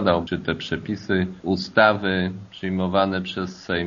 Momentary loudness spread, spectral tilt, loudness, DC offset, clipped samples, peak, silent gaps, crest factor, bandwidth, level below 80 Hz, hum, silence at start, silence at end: 11 LU; -4 dB/octave; -23 LUFS; under 0.1%; under 0.1%; -2 dBFS; none; 22 dB; 7.2 kHz; -52 dBFS; none; 0 s; 0 s